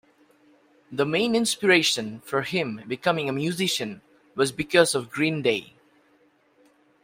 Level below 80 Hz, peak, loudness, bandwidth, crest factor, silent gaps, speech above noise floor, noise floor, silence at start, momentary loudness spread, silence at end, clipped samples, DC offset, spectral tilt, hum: -66 dBFS; -4 dBFS; -24 LUFS; 16 kHz; 22 dB; none; 38 dB; -62 dBFS; 0.9 s; 11 LU; 1.4 s; under 0.1%; under 0.1%; -3.5 dB/octave; none